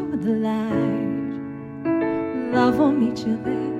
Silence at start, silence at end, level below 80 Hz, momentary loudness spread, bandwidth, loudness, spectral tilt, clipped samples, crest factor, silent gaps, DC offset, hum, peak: 0 s; 0 s; -56 dBFS; 10 LU; 12 kHz; -23 LUFS; -7.5 dB/octave; under 0.1%; 16 dB; none; under 0.1%; none; -6 dBFS